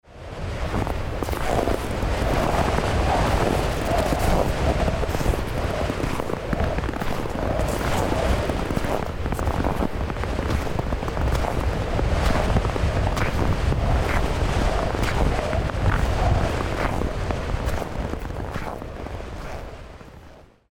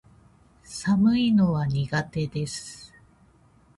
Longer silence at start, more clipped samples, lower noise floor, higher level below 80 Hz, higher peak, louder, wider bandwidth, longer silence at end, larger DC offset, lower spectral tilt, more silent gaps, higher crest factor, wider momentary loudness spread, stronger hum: second, 0.1 s vs 0.7 s; neither; second, -47 dBFS vs -58 dBFS; first, -28 dBFS vs -52 dBFS; first, -8 dBFS vs -12 dBFS; about the same, -25 LUFS vs -24 LUFS; first, 17.5 kHz vs 11.5 kHz; second, 0.3 s vs 0.9 s; neither; about the same, -6 dB/octave vs -6 dB/octave; neither; about the same, 14 dB vs 14 dB; second, 9 LU vs 18 LU; neither